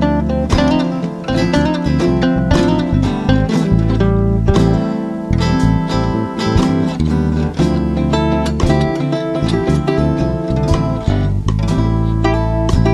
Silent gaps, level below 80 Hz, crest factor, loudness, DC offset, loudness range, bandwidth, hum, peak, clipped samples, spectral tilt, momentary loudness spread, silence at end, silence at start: none; -22 dBFS; 14 dB; -15 LUFS; under 0.1%; 2 LU; 11.5 kHz; none; 0 dBFS; under 0.1%; -7.5 dB/octave; 4 LU; 0 s; 0 s